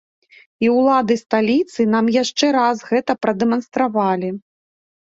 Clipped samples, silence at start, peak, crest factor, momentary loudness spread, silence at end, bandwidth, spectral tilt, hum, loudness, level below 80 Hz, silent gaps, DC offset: under 0.1%; 0.6 s; -2 dBFS; 16 dB; 5 LU; 0.65 s; 7.8 kHz; -5 dB/octave; none; -18 LUFS; -62 dBFS; none; under 0.1%